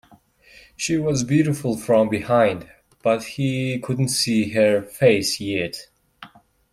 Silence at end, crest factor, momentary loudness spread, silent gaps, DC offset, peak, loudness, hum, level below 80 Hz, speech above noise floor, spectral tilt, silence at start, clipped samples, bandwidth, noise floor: 0.45 s; 18 dB; 8 LU; none; under 0.1%; -4 dBFS; -21 LUFS; none; -56 dBFS; 33 dB; -5 dB/octave; 0.8 s; under 0.1%; 16 kHz; -53 dBFS